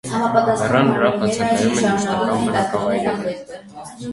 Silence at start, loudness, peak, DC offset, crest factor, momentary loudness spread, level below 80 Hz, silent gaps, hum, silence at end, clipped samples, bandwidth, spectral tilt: 0.05 s; -18 LUFS; 0 dBFS; under 0.1%; 18 dB; 16 LU; -52 dBFS; none; none; 0 s; under 0.1%; 11.5 kHz; -5 dB/octave